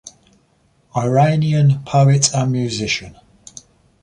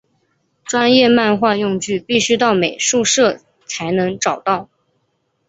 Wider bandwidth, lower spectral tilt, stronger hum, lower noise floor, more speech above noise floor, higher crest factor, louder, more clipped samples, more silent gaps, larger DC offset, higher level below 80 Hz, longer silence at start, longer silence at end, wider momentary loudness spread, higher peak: first, 10 kHz vs 8.2 kHz; first, -5 dB/octave vs -3 dB/octave; neither; second, -58 dBFS vs -67 dBFS; second, 43 dB vs 52 dB; about the same, 16 dB vs 16 dB; about the same, -16 LUFS vs -15 LUFS; neither; neither; neither; first, -50 dBFS vs -58 dBFS; second, 0.05 s vs 0.65 s; about the same, 0.95 s vs 0.85 s; about the same, 9 LU vs 10 LU; about the same, -2 dBFS vs -2 dBFS